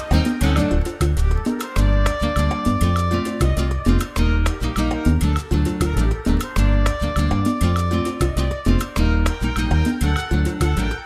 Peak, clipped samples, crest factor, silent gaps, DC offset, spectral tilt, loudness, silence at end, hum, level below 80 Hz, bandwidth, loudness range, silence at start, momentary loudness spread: -2 dBFS; under 0.1%; 16 dB; none; under 0.1%; -6.5 dB/octave; -20 LUFS; 0 s; none; -22 dBFS; 15 kHz; 0 LU; 0 s; 3 LU